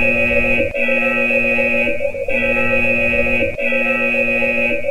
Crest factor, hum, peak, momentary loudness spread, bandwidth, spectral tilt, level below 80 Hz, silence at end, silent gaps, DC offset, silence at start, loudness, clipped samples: 14 dB; none; -2 dBFS; 3 LU; 16.5 kHz; -6 dB/octave; -34 dBFS; 0 s; none; 5%; 0 s; -15 LUFS; under 0.1%